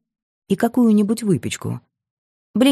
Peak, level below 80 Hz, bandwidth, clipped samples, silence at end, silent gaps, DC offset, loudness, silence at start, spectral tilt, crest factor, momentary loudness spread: -4 dBFS; -62 dBFS; 14 kHz; under 0.1%; 0 s; 2.11-2.54 s; under 0.1%; -19 LUFS; 0.5 s; -6 dB/octave; 16 dB; 13 LU